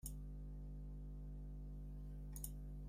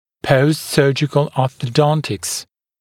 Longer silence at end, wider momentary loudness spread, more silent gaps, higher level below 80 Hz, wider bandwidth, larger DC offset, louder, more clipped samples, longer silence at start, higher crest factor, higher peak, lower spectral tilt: second, 0 s vs 0.35 s; second, 3 LU vs 7 LU; neither; about the same, -52 dBFS vs -52 dBFS; about the same, 16 kHz vs 16.5 kHz; neither; second, -53 LUFS vs -17 LUFS; neither; second, 0.05 s vs 0.25 s; about the same, 22 dB vs 18 dB; second, -28 dBFS vs 0 dBFS; about the same, -6 dB/octave vs -5.5 dB/octave